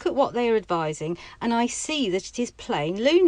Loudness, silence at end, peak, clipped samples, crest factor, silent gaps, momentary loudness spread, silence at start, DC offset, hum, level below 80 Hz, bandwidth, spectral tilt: -25 LUFS; 0 s; -8 dBFS; under 0.1%; 16 dB; none; 8 LU; 0 s; under 0.1%; none; -54 dBFS; 10.5 kHz; -4 dB/octave